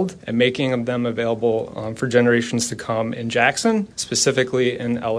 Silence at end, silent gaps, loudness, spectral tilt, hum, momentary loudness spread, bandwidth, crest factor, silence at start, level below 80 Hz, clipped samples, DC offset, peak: 0 s; none; -20 LUFS; -4 dB/octave; none; 7 LU; 11 kHz; 18 dB; 0 s; -56 dBFS; under 0.1%; under 0.1%; -2 dBFS